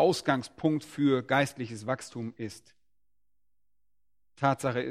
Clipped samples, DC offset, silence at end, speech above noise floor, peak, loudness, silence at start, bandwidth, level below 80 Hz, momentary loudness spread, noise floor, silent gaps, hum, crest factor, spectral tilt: under 0.1%; under 0.1%; 0 s; 56 dB; -10 dBFS; -30 LUFS; 0 s; 15 kHz; -68 dBFS; 13 LU; -85 dBFS; none; none; 22 dB; -5.5 dB/octave